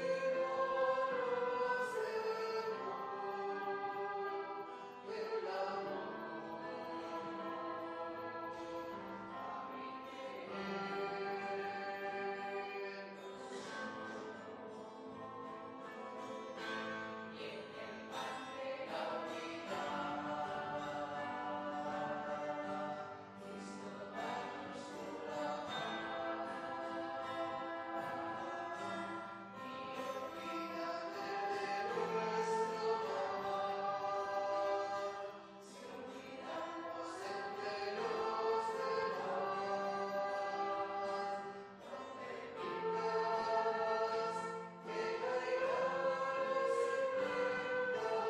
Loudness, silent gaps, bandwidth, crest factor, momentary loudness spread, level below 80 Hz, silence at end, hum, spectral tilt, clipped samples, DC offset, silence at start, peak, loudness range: -41 LUFS; none; 15 kHz; 16 dB; 11 LU; -80 dBFS; 0 s; none; -4.5 dB/octave; under 0.1%; under 0.1%; 0 s; -24 dBFS; 7 LU